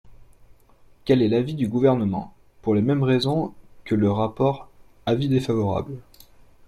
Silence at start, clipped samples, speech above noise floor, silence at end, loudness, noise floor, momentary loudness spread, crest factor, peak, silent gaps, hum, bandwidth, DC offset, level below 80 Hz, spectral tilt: 0.05 s; under 0.1%; 31 dB; 0.65 s; -23 LUFS; -53 dBFS; 13 LU; 18 dB; -6 dBFS; none; none; 13.5 kHz; under 0.1%; -52 dBFS; -8 dB/octave